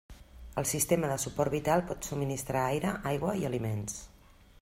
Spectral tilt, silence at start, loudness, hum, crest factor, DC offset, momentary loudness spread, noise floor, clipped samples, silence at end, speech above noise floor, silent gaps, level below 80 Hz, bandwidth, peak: -5 dB/octave; 0.1 s; -32 LUFS; none; 20 dB; under 0.1%; 9 LU; -57 dBFS; under 0.1%; 0.55 s; 26 dB; none; -52 dBFS; 16 kHz; -12 dBFS